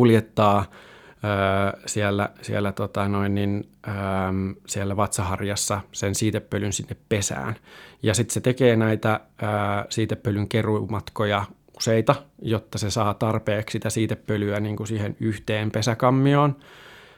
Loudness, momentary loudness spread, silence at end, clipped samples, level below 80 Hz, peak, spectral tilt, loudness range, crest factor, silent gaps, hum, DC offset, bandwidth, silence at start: -24 LUFS; 9 LU; 0.2 s; under 0.1%; -54 dBFS; -2 dBFS; -5.5 dB/octave; 3 LU; 22 dB; none; none; under 0.1%; 16.5 kHz; 0 s